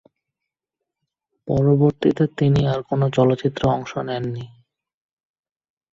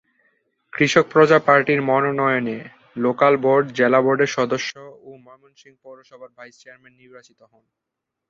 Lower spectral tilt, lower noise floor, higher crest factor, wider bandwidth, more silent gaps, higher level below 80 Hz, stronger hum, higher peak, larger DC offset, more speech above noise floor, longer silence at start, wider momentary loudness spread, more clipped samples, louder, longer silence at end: first, -8.5 dB/octave vs -5.5 dB/octave; first, -84 dBFS vs -66 dBFS; about the same, 18 dB vs 20 dB; about the same, 7.4 kHz vs 7.8 kHz; neither; first, -48 dBFS vs -64 dBFS; neither; about the same, -4 dBFS vs -2 dBFS; neither; first, 65 dB vs 46 dB; first, 1.45 s vs 0.75 s; second, 12 LU vs 15 LU; neither; about the same, -20 LUFS vs -18 LUFS; first, 1.45 s vs 1.1 s